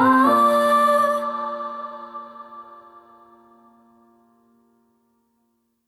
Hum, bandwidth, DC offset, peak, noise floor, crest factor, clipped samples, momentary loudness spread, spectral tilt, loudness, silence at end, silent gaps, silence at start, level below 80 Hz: none; 15 kHz; under 0.1%; -6 dBFS; -69 dBFS; 18 dB; under 0.1%; 24 LU; -4.5 dB/octave; -19 LUFS; 3.25 s; none; 0 s; -72 dBFS